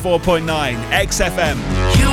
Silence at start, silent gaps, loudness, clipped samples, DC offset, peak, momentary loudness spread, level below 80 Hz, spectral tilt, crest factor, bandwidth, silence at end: 0 s; none; -17 LUFS; under 0.1%; under 0.1%; -4 dBFS; 4 LU; -24 dBFS; -4.5 dB/octave; 12 dB; 17 kHz; 0 s